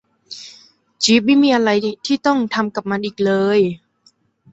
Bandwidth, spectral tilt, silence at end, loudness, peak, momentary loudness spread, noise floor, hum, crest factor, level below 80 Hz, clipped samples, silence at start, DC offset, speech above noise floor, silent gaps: 8.2 kHz; -4.5 dB/octave; 0.75 s; -17 LUFS; -2 dBFS; 21 LU; -57 dBFS; none; 16 dB; -60 dBFS; under 0.1%; 0.3 s; under 0.1%; 41 dB; none